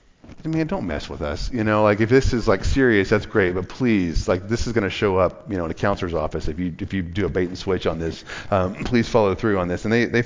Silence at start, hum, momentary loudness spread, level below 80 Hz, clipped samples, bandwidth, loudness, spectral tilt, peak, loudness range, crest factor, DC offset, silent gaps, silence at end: 0.3 s; none; 10 LU; -34 dBFS; under 0.1%; 7.6 kHz; -22 LUFS; -6.5 dB/octave; -4 dBFS; 5 LU; 16 dB; under 0.1%; none; 0 s